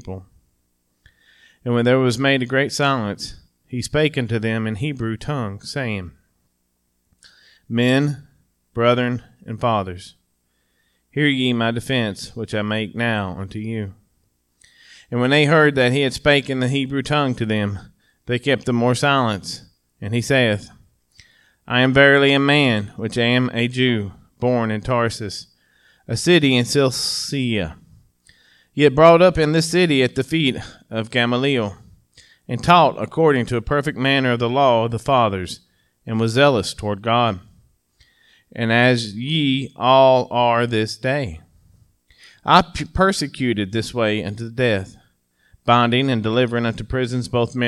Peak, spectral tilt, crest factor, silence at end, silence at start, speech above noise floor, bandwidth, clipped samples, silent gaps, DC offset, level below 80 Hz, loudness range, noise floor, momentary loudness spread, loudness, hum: 0 dBFS; -5.5 dB/octave; 20 dB; 0 s; 0.05 s; 50 dB; 13.5 kHz; under 0.1%; none; under 0.1%; -46 dBFS; 6 LU; -69 dBFS; 15 LU; -18 LUFS; none